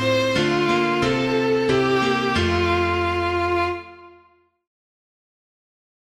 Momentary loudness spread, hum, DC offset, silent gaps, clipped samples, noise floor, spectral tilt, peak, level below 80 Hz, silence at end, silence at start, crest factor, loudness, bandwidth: 3 LU; none; under 0.1%; none; under 0.1%; -57 dBFS; -5.5 dB/octave; -8 dBFS; -44 dBFS; 2.05 s; 0 s; 14 dB; -20 LUFS; 13.5 kHz